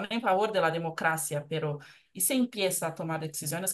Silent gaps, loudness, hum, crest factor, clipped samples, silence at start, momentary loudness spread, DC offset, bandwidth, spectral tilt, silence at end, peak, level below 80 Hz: none; -29 LUFS; none; 18 dB; under 0.1%; 0 s; 8 LU; under 0.1%; 13 kHz; -3.5 dB/octave; 0 s; -12 dBFS; -76 dBFS